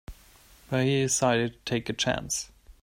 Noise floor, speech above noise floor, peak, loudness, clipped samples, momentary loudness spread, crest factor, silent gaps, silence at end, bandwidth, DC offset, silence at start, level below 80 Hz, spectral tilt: -55 dBFS; 29 dB; -10 dBFS; -27 LUFS; under 0.1%; 8 LU; 18 dB; none; 0.1 s; 16 kHz; under 0.1%; 0.1 s; -52 dBFS; -4 dB/octave